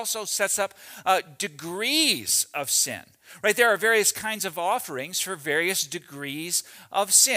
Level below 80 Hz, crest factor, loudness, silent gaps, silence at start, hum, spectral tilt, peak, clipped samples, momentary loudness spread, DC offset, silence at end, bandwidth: -72 dBFS; 22 dB; -24 LUFS; none; 0 s; none; -0.5 dB/octave; -4 dBFS; under 0.1%; 11 LU; under 0.1%; 0 s; 16 kHz